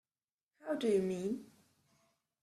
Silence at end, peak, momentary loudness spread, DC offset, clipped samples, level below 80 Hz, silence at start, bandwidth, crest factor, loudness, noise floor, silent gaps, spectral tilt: 0.95 s; -22 dBFS; 12 LU; under 0.1%; under 0.1%; -78 dBFS; 0.65 s; 13 kHz; 18 dB; -36 LUFS; under -90 dBFS; none; -6.5 dB/octave